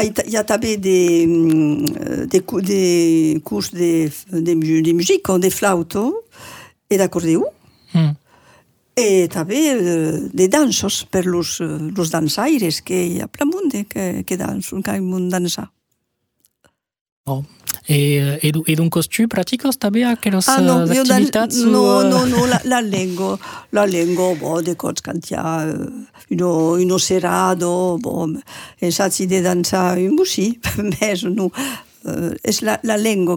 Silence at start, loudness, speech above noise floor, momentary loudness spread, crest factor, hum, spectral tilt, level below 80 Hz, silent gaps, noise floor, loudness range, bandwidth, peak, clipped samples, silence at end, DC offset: 0 s; -17 LUFS; 54 dB; 10 LU; 18 dB; none; -5 dB/octave; -52 dBFS; 17.01-17.05 s, 17.12-17.24 s; -71 dBFS; 6 LU; over 20 kHz; 0 dBFS; under 0.1%; 0 s; under 0.1%